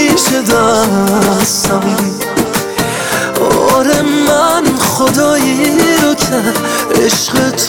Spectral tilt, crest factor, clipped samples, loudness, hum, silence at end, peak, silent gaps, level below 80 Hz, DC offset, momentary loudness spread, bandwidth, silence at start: -3.5 dB/octave; 10 dB; under 0.1%; -11 LUFS; none; 0 s; 0 dBFS; none; -40 dBFS; under 0.1%; 5 LU; 19.5 kHz; 0 s